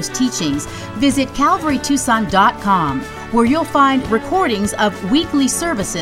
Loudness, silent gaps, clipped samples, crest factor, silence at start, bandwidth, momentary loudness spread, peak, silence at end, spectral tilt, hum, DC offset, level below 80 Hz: -16 LUFS; none; under 0.1%; 16 dB; 0 s; 16 kHz; 6 LU; 0 dBFS; 0 s; -4 dB/octave; none; under 0.1%; -38 dBFS